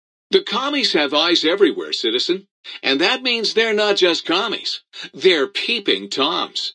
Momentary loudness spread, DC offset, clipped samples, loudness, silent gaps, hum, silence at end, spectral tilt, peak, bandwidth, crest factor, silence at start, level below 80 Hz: 8 LU; under 0.1%; under 0.1%; -18 LUFS; 2.51-2.63 s; none; 0.05 s; -2.5 dB/octave; -2 dBFS; 10.5 kHz; 18 dB; 0.3 s; -76 dBFS